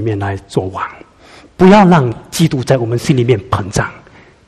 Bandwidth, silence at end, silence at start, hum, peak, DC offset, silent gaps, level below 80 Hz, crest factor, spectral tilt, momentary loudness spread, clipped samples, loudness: 14.5 kHz; 0.5 s; 0 s; none; 0 dBFS; under 0.1%; none; -40 dBFS; 14 dB; -6.5 dB/octave; 14 LU; 0.4%; -13 LUFS